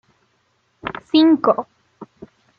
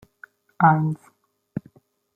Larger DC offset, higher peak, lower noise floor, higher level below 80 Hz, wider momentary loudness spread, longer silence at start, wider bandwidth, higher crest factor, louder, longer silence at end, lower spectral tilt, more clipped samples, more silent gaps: neither; about the same, -2 dBFS vs -2 dBFS; first, -65 dBFS vs -56 dBFS; about the same, -62 dBFS vs -64 dBFS; about the same, 18 LU vs 18 LU; first, 0.85 s vs 0.6 s; first, 5.4 kHz vs 3.9 kHz; about the same, 18 dB vs 22 dB; first, -16 LUFS vs -20 LUFS; about the same, 0.55 s vs 0.55 s; second, -7 dB/octave vs -10 dB/octave; neither; neither